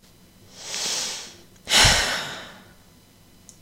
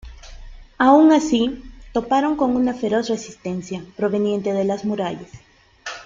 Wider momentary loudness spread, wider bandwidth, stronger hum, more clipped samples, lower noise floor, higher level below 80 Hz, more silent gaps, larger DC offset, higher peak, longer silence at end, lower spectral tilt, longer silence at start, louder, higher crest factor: first, 26 LU vs 16 LU; first, 16 kHz vs 7.6 kHz; neither; neither; first, -53 dBFS vs -38 dBFS; first, -40 dBFS vs -46 dBFS; neither; neither; about the same, -4 dBFS vs -2 dBFS; first, 1 s vs 0 s; second, -1 dB/octave vs -5.5 dB/octave; first, 0.55 s vs 0.05 s; about the same, -20 LUFS vs -19 LUFS; about the same, 22 dB vs 18 dB